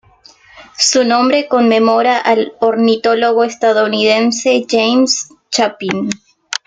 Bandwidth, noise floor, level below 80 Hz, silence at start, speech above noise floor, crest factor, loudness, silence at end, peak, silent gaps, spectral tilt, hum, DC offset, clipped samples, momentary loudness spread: 9.6 kHz; -45 dBFS; -60 dBFS; 0.55 s; 33 dB; 12 dB; -13 LUFS; 0.1 s; 0 dBFS; none; -3 dB/octave; none; under 0.1%; under 0.1%; 8 LU